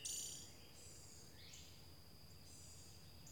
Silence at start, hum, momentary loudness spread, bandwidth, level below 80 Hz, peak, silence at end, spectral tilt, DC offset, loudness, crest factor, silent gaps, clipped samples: 0 s; none; 13 LU; 17.5 kHz; -70 dBFS; -34 dBFS; 0 s; -1.5 dB/octave; under 0.1%; -55 LUFS; 22 dB; none; under 0.1%